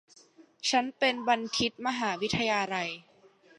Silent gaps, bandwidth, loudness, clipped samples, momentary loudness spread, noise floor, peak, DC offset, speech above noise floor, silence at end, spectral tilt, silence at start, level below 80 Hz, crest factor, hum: none; 11.5 kHz; -29 LUFS; under 0.1%; 7 LU; -60 dBFS; -10 dBFS; under 0.1%; 31 dB; 0.6 s; -3 dB/octave; 0.4 s; -64 dBFS; 20 dB; none